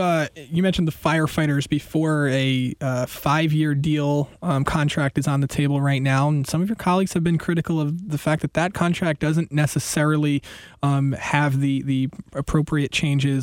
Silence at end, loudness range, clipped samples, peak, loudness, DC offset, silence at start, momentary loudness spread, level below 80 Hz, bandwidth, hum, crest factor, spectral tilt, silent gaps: 0 s; 1 LU; under 0.1%; -4 dBFS; -22 LUFS; under 0.1%; 0 s; 4 LU; -46 dBFS; 17 kHz; none; 16 dB; -6 dB/octave; none